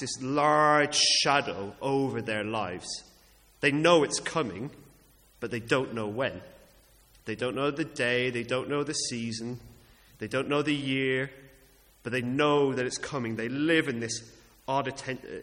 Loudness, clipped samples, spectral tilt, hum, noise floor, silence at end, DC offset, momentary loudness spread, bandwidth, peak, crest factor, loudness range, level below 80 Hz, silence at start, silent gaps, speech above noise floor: -28 LUFS; under 0.1%; -3.5 dB/octave; none; -59 dBFS; 0 s; under 0.1%; 16 LU; 16.5 kHz; -8 dBFS; 22 dB; 6 LU; -62 dBFS; 0 s; none; 31 dB